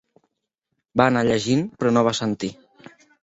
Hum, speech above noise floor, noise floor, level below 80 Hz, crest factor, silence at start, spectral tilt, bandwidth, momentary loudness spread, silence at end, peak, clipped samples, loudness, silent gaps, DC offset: none; 58 dB; -79 dBFS; -56 dBFS; 20 dB; 0.95 s; -5.5 dB/octave; 8 kHz; 9 LU; 0.7 s; -2 dBFS; under 0.1%; -21 LUFS; none; under 0.1%